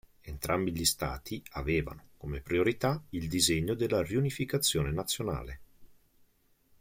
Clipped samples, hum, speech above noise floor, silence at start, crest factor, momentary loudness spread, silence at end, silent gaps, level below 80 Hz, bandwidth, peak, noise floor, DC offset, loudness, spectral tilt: under 0.1%; none; 36 dB; 0.25 s; 22 dB; 13 LU; 0.9 s; none; -48 dBFS; 16.5 kHz; -12 dBFS; -68 dBFS; under 0.1%; -31 LUFS; -4 dB/octave